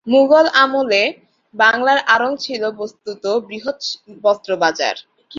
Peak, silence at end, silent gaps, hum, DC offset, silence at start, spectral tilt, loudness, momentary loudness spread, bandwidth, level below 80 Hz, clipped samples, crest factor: 0 dBFS; 0 s; none; none; under 0.1%; 0.05 s; -3 dB/octave; -16 LUFS; 14 LU; 7.6 kHz; -66 dBFS; under 0.1%; 16 dB